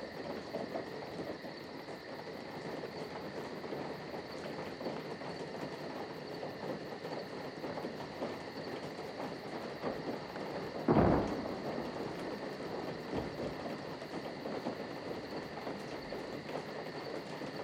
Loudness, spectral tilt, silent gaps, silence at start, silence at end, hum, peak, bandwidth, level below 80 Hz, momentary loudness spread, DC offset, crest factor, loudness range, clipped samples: -41 LUFS; -6.5 dB/octave; none; 0 s; 0 s; none; -16 dBFS; 17 kHz; -58 dBFS; 4 LU; under 0.1%; 24 dB; 8 LU; under 0.1%